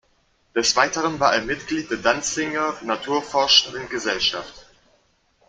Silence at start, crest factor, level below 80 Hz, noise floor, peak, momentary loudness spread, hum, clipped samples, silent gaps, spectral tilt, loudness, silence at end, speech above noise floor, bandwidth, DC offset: 0.55 s; 22 dB; -54 dBFS; -63 dBFS; 0 dBFS; 11 LU; none; under 0.1%; none; -1.5 dB/octave; -21 LUFS; 0.85 s; 41 dB; 12 kHz; under 0.1%